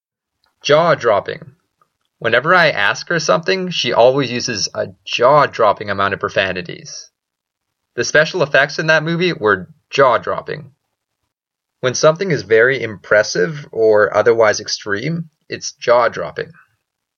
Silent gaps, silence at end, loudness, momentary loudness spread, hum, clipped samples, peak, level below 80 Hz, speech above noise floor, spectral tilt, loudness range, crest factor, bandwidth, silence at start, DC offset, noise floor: none; 0.7 s; -15 LUFS; 14 LU; none; under 0.1%; 0 dBFS; -60 dBFS; 65 dB; -4 dB/octave; 3 LU; 16 dB; 7.2 kHz; 0.65 s; under 0.1%; -80 dBFS